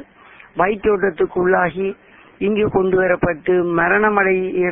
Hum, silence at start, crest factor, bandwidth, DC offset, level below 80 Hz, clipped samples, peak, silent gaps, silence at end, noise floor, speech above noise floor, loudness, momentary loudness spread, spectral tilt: none; 0 s; 18 dB; 3.7 kHz; under 0.1%; -46 dBFS; under 0.1%; 0 dBFS; none; 0 s; -45 dBFS; 28 dB; -17 LUFS; 6 LU; -12 dB/octave